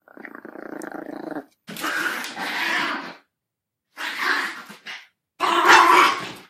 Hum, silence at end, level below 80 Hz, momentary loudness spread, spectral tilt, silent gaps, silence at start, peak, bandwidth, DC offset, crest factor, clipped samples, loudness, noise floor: none; 0.05 s; -68 dBFS; 25 LU; -1.5 dB/octave; none; 0.25 s; -2 dBFS; 15.5 kHz; under 0.1%; 20 dB; under 0.1%; -19 LUFS; -84 dBFS